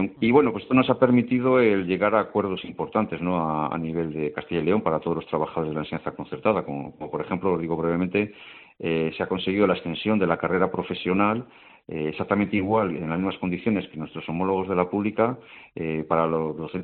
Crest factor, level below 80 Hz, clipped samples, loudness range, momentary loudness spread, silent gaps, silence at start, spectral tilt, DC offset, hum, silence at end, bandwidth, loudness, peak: 20 dB; -58 dBFS; under 0.1%; 5 LU; 12 LU; none; 0 s; -5.5 dB/octave; under 0.1%; none; 0 s; 4.4 kHz; -25 LUFS; -4 dBFS